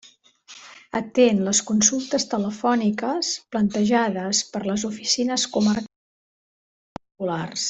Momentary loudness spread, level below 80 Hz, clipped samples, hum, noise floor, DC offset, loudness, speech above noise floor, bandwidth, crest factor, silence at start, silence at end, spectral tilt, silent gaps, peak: 12 LU; -62 dBFS; under 0.1%; none; -50 dBFS; under 0.1%; -22 LUFS; 28 dB; 8.2 kHz; 20 dB; 0.5 s; 0 s; -3.5 dB/octave; 5.96-6.96 s; -2 dBFS